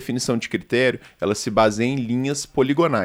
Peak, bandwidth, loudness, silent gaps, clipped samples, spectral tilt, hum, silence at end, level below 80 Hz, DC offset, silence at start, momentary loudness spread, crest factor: -2 dBFS; 16 kHz; -21 LUFS; none; under 0.1%; -5 dB/octave; none; 0 s; -50 dBFS; under 0.1%; 0 s; 6 LU; 18 dB